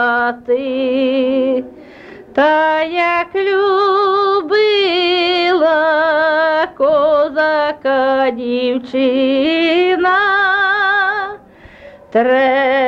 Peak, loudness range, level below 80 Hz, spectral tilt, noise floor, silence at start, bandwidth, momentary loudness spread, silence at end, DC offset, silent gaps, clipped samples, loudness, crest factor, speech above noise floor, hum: -4 dBFS; 2 LU; -54 dBFS; -5 dB/octave; -40 dBFS; 0 s; 7.6 kHz; 5 LU; 0 s; under 0.1%; none; under 0.1%; -14 LUFS; 10 dB; 26 dB; none